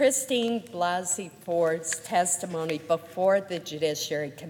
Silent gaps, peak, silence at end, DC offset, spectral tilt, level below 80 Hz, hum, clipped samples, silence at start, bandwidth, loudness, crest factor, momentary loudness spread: none; -10 dBFS; 0 s; under 0.1%; -3 dB/octave; -74 dBFS; none; under 0.1%; 0 s; 17.5 kHz; -27 LUFS; 16 dB; 6 LU